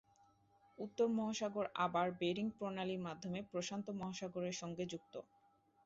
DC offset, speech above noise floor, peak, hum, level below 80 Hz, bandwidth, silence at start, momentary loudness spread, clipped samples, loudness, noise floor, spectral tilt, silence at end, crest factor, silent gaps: under 0.1%; 32 dB; -24 dBFS; none; -78 dBFS; 7.6 kHz; 0.8 s; 10 LU; under 0.1%; -42 LUFS; -74 dBFS; -4.5 dB/octave; 0.65 s; 18 dB; none